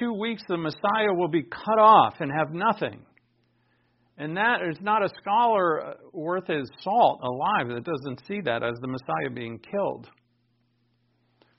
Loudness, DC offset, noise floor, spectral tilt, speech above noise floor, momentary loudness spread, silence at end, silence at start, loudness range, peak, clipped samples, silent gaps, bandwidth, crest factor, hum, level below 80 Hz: -25 LUFS; under 0.1%; -69 dBFS; -3.5 dB/octave; 45 dB; 13 LU; 1.55 s; 0 s; 8 LU; -6 dBFS; under 0.1%; none; 5.8 kHz; 20 dB; none; -68 dBFS